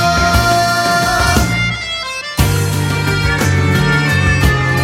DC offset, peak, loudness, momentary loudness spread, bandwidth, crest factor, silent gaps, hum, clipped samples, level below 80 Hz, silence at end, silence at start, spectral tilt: under 0.1%; 0 dBFS; -13 LUFS; 5 LU; 17 kHz; 14 dB; none; none; under 0.1%; -24 dBFS; 0 s; 0 s; -4.5 dB/octave